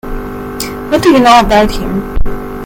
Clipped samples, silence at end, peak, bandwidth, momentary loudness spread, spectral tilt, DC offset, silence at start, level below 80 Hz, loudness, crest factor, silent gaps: 0.5%; 0 s; 0 dBFS; 17.5 kHz; 16 LU; -5 dB/octave; under 0.1%; 0.05 s; -20 dBFS; -10 LUFS; 10 dB; none